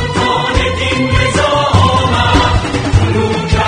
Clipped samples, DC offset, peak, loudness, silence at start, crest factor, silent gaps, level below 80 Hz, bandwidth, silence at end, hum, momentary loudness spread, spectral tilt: 0.1%; under 0.1%; 0 dBFS; -12 LUFS; 0 s; 12 dB; none; -22 dBFS; 10 kHz; 0 s; none; 4 LU; -5 dB/octave